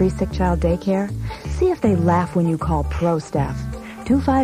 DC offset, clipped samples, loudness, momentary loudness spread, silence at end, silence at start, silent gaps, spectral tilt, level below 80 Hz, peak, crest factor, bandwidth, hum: under 0.1%; under 0.1%; -20 LUFS; 10 LU; 0 s; 0 s; none; -8 dB/octave; -30 dBFS; -4 dBFS; 14 dB; 13 kHz; none